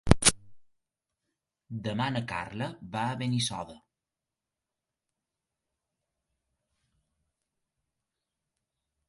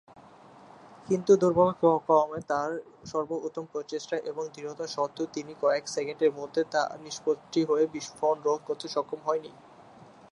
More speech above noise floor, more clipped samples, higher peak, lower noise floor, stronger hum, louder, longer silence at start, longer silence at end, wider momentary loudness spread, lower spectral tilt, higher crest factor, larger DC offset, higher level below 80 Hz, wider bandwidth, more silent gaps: first, 57 dB vs 24 dB; neither; first, 0 dBFS vs -8 dBFS; first, -89 dBFS vs -52 dBFS; neither; about the same, -30 LUFS vs -29 LUFS; second, 0.05 s vs 0.85 s; first, 5.3 s vs 0.25 s; first, 18 LU vs 12 LU; second, -3.5 dB/octave vs -5 dB/octave; first, 34 dB vs 20 dB; neither; first, -46 dBFS vs -70 dBFS; about the same, 11.5 kHz vs 11 kHz; neither